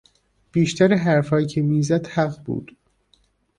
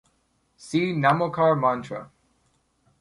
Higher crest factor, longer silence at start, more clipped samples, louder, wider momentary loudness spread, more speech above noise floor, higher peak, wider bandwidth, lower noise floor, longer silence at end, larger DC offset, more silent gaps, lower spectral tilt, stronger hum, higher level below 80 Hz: about the same, 18 dB vs 20 dB; about the same, 0.55 s vs 0.6 s; neither; about the same, -21 LUFS vs -23 LUFS; about the same, 11 LU vs 13 LU; about the same, 43 dB vs 46 dB; about the same, -4 dBFS vs -6 dBFS; about the same, 10.5 kHz vs 11.5 kHz; second, -62 dBFS vs -69 dBFS; about the same, 0.95 s vs 0.95 s; neither; neither; about the same, -6.5 dB/octave vs -6.5 dB/octave; neither; first, -56 dBFS vs -64 dBFS